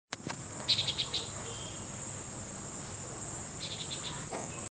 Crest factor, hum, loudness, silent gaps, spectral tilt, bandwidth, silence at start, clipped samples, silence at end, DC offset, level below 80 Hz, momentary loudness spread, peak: 24 dB; none; -37 LUFS; none; -2 dB/octave; 10 kHz; 0.1 s; under 0.1%; 0.05 s; under 0.1%; -58 dBFS; 12 LU; -14 dBFS